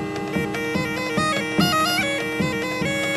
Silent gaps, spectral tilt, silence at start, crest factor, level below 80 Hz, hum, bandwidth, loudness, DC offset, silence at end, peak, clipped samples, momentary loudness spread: none; -4 dB/octave; 0 s; 16 dB; -50 dBFS; none; 13 kHz; -22 LUFS; under 0.1%; 0 s; -6 dBFS; under 0.1%; 6 LU